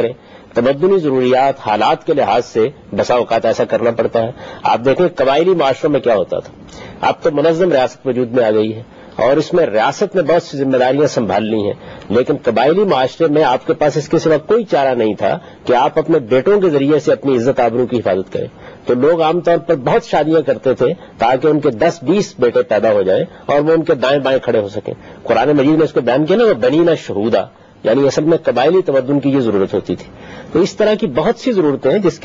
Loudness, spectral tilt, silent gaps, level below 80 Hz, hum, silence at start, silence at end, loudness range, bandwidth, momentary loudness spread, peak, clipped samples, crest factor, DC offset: -14 LUFS; -6.5 dB/octave; none; -48 dBFS; none; 0 s; 0.05 s; 2 LU; 7.6 kHz; 7 LU; -2 dBFS; under 0.1%; 12 dB; under 0.1%